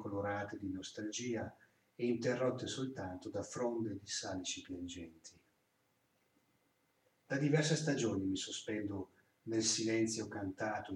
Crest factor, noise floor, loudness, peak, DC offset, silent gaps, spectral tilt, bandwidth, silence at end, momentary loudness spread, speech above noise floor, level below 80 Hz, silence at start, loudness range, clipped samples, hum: 20 dB; -78 dBFS; -39 LUFS; -18 dBFS; under 0.1%; none; -4.5 dB/octave; 12 kHz; 0 s; 13 LU; 40 dB; -76 dBFS; 0 s; 9 LU; under 0.1%; none